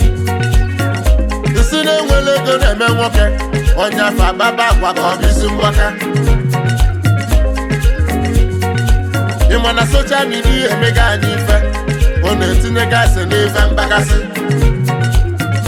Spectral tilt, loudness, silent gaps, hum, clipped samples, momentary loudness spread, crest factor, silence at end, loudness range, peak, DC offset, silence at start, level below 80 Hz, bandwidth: -5 dB/octave; -13 LUFS; none; none; under 0.1%; 4 LU; 10 dB; 0 s; 1 LU; -2 dBFS; under 0.1%; 0 s; -14 dBFS; 16 kHz